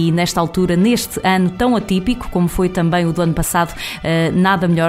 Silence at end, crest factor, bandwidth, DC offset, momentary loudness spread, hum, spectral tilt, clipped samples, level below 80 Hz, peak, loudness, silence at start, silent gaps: 0 s; 14 dB; 16 kHz; under 0.1%; 4 LU; none; -5.5 dB/octave; under 0.1%; -34 dBFS; -2 dBFS; -16 LUFS; 0 s; none